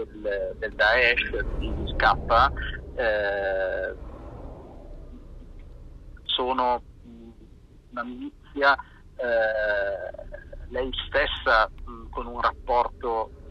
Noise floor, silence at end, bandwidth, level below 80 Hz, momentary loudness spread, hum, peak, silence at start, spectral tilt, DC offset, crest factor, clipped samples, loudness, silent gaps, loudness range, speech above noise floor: -50 dBFS; 0 s; 10 kHz; -38 dBFS; 21 LU; none; -4 dBFS; 0 s; -6 dB/octave; under 0.1%; 22 dB; under 0.1%; -25 LUFS; none; 8 LU; 25 dB